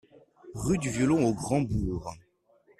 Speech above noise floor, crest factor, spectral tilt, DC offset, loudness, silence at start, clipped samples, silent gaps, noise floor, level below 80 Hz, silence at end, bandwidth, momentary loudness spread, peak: 37 dB; 16 dB; -6.5 dB/octave; under 0.1%; -28 LUFS; 0.45 s; under 0.1%; none; -64 dBFS; -46 dBFS; 0.6 s; 13.5 kHz; 14 LU; -12 dBFS